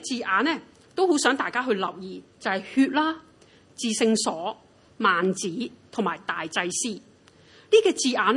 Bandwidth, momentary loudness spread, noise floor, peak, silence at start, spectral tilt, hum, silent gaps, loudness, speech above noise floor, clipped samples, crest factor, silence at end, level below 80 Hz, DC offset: 11.5 kHz; 13 LU; -55 dBFS; -6 dBFS; 0 s; -3 dB/octave; none; none; -25 LUFS; 31 dB; under 0.1%; 20 dB; 0 s; -72 dBFS; under 0.1%